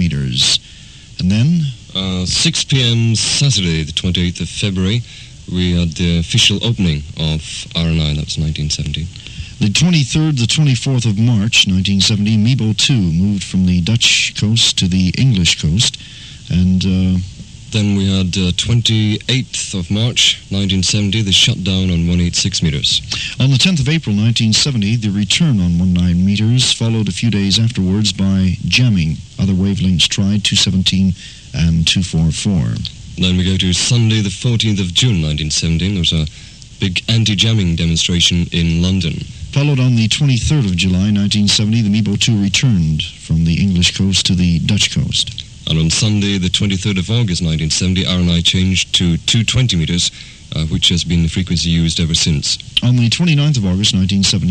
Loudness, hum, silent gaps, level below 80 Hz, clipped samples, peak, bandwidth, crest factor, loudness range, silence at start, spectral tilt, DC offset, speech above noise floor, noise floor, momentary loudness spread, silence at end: -14 LUFS; none; none; -32 dBFS; under 0.1%; 0 dBFS; 11 kHz; 14 dB; 3 LU; 0 s; -4 dB/octave; under 0.1%; 23 dB; -37 dBFS; 7 LU; 0 s